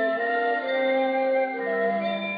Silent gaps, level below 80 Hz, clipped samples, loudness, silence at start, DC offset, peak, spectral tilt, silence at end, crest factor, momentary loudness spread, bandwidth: none; -80 dBFS; under 0.1%; -24 LUFS; 0 s; under 0.1%; -14 dBFS; -8 dB/octave; 0 s; 12 dB; 2 LU; 5 kHz